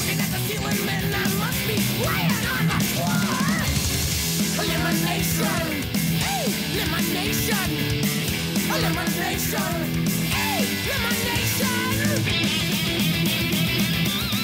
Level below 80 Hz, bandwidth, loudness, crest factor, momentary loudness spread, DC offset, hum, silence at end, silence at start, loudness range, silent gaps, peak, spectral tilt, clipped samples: -40 dBFS; 16.5 kHz; -22 LUFS; 12 dB; 2 LU; under 0.1%; none; 0 s; 0 s; 1 LU; none; -10 dBFS; -4 dB/octave; under 0.1%